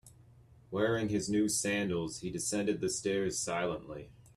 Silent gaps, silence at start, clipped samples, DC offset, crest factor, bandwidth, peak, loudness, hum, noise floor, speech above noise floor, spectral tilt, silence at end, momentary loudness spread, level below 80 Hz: none; 0.05 s; under 0.1%; under 0.1%; 16 dB; 14 kHz; -18 dBFS; -33 LUFS; none; -59 dBFS; 26 dB; -4 dB/octave; 0.15 s; 9 LU; -62 dBFS